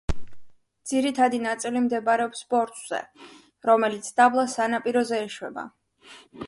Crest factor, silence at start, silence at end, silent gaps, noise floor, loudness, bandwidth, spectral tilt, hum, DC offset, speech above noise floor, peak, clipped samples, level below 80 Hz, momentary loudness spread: 20 dB; 0.1 s; 0 s; none; -43 dBFS; -24 LUFS; 11.5 kHz; -4 dB/octave; none; under 0.1%; 19 dB; -6 dBFS; under 0.1%; -46 dBFS; 15 LU